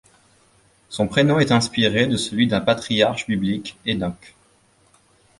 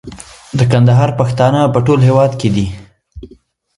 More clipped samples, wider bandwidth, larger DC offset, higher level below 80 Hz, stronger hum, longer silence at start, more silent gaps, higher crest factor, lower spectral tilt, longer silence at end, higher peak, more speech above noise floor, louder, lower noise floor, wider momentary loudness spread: neither; about the same, 11.5 kHz vs 11 kHz; neither; second, -50 dBFS vs -38 dBFS; neither; first, 0.9 s vs 0.05 s; neither; first, 20 dB vs 12 dB; second, -5 dB/octave vs -7.5 dB/octave; first, 1.1 s vs 0.5 s; about the same, -2 dBFS vs 0 dBFS; about the same, 38 dB vs 35 dB; second, -20 LUFS vs -12 LUFS; first, -58 dBFS vs -46 dBFS; second, 9 LU vs 16 LU